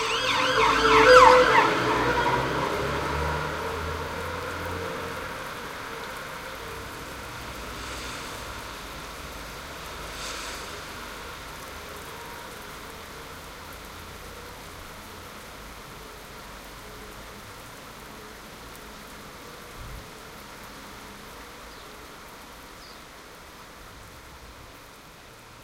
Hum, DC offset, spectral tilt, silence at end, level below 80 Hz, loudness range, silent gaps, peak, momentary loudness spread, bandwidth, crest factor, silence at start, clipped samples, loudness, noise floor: none; under 0.1%; -3.5 dB/octave; 0 s; -46 dBFS; 22 LU; none; 0 dBFS; 22 LU; 16.5 kHz; 28 dB; 0 s; under 0.1%; -24 LUFS; -47 dBFS